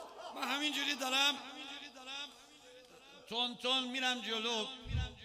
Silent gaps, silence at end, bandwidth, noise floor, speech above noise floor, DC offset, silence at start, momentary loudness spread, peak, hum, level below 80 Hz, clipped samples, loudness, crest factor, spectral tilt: none; 0 s; 15.5 kHz; -58 dBFS; 22 dB; under 0.1%; 0 s; 15 LU; -18 dBFS; none; -54 dBFS; under 0.1%; -35 LUFS; 20 dB; -2.5 dB/octave